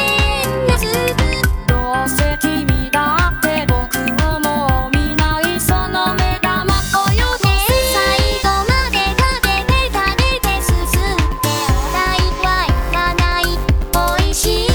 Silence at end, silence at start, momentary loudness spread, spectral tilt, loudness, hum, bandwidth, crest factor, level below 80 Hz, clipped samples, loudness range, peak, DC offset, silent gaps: 0 s; 0 s; 3 LU; -4 dB/octave; -15 LUFS; none; over 20 kHz; 14 dB; -20 dBFS; under 0.1%; 2 LU; 0 dBFS; under 0.1%; none